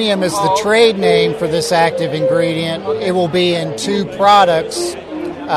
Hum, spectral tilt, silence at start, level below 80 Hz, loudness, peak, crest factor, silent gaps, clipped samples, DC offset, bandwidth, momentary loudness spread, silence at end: none; -4.5 dB/octave; 0 s; -50 dBFS; -14 LUFS; 0 dBFS; 14 dB; none; under 0.1%; under 0.1%; 13.5 kHz; 10 LU; 0 s